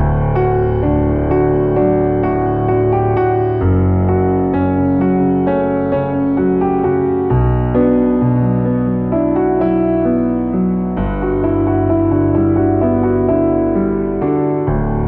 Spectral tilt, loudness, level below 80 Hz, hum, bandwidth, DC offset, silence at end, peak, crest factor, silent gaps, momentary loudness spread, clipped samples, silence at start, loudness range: -13.5 dB/octave; -15 LUFS; -28 dBFS; none; 4 kHz; under 0.1%; 0 s; -2 dBFS; 12 dB; none; 3 LU; under 0.1%; 0 s; 1 LU